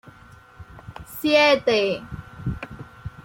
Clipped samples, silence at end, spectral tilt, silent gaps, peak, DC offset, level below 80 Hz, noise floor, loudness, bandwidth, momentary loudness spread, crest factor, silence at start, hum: under 0.1%; 0.05 s; -5 dB/octave; none; -6 dBFS; under 0.1%; -46 dBFS; -48 dBFS; -21 LUFS; 16.5 kHz; 24 LU; 18 dB; 0.05 s; none